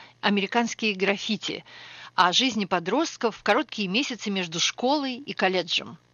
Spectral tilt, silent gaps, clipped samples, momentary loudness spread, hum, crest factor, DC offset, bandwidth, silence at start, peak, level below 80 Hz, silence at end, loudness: -3 dB/octave; none; under 0.1%; 8 LU; none; 20 dB; under 0.1%; 7.4 kHz; 0 s; -6 dBFS; -70 dBFS; 0.2 s; -25 LUFS